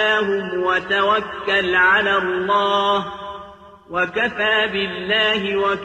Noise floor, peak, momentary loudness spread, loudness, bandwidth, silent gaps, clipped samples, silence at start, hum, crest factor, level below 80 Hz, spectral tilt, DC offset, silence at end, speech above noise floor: -41 dBFS; -6 dBFS; 8 LU; -18 LUFS; 9 kHz; none; under 0.1%; 0 s; none; 14 dB; -52 dBFS; -4.5 dB/octave; under 0.1%; 0 s; 22 dB